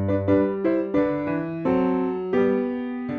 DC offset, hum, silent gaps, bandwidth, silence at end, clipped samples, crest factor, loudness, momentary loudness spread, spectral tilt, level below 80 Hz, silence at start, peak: under 0.1%; none; none; 6.2 kHz; 0 s; under 0.1%; 14 dB; -23 LUFS; 5 LU; -10 dB/octave; -54 dBFS; 0 s; -10 dBFS